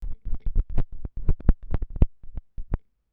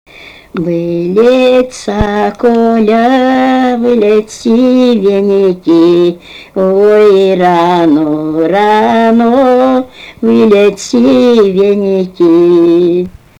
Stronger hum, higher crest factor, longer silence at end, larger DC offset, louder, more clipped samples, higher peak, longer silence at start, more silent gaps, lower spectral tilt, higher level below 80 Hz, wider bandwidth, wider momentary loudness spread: neither; first, 22 dB vs 8 dB; about the same, 0.35 s vs 0.3 s; neither; second, -31 LUFS vs -8 LUFS; neither; about the same, 0 dBFS vs 0 dBFS; second, 0 s vs 0.2 s; neither; first, -11 dB/octave vs -6.5 dB/octave; first, -26 dBFS vs -38 dBFS; second, 2.6 kHz vs 11 kHz; first, 12 LU vs 7 LU